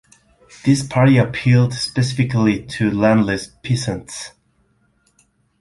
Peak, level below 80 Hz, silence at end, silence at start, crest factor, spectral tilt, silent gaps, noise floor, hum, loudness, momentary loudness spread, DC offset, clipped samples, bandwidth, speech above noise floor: -2 dBFS; -48 dBFS; 1.35 s; 0.65 s; 16 dB; -6.5 dB/octave; none; -61 dBFS; none; -17 LUFS; 12 LU; under 0.1%; under 0.1%; 11.5 kHz; 44 dB